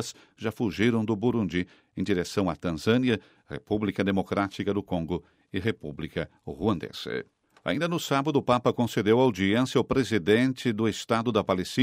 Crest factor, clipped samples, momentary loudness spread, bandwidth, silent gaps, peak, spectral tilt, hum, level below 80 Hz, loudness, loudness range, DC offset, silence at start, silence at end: 18 dB; under 0.1%; 12 LU; 16 kHz; none; -8 dBFS; -6 dB/octave; none; -54 dBFS; -27 LUFS; 6 LU; under 0.1%; 0 s; 0 s